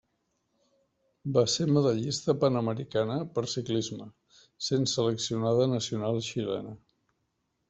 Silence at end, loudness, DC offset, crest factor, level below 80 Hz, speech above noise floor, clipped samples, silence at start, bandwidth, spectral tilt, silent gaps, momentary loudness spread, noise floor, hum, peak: 0.9 s; -29 LUFS; under 0.1%; 20 dB; -66 dBFS; 50 dB; under 0.1%; 1.25 s; 8.2 kHz; -5.5 dB/octave; none; 10 LU; -78 dBFS; none; -10 dBFS